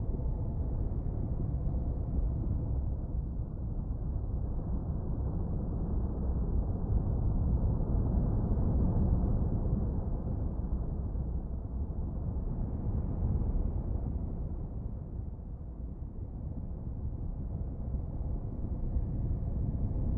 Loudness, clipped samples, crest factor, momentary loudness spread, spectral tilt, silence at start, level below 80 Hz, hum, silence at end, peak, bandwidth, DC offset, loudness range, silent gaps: -35 LUFS; under 0.1%; 16 dB; 9 LU; -14.5 dB/octave; 0 s; -34 dBFS; none; 0 s; -16 dBFS; 1.8 kHz; under 0.1%; 8 LU; none